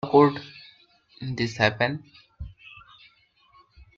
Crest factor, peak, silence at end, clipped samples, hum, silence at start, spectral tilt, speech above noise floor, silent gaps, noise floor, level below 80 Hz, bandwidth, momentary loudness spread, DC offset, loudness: 22 dB; -4 dBFS; 1.45 s; under 0.1%; none; 0.05 s; -6.5 dB/octave; 38 dB; none; -61 dBFS; -54 dBFS; 7.6 kHz; 27 LU; under 0.1%; -24 LUFS